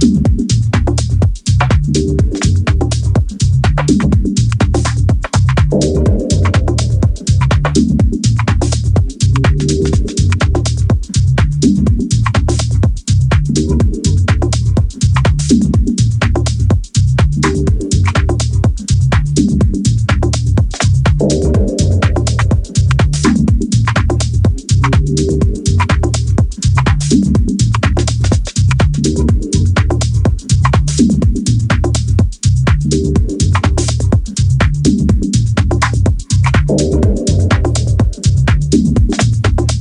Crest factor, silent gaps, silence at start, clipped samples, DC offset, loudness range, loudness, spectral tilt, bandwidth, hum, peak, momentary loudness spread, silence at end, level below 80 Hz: 10 dB; none; 0 s; under 0.1%; under 0.1%; 1 LU; -13 LUFS; -6 dB/octave; 11 kHz; none; 0 dBFS; 2 LU; 0 s; -18 dBFS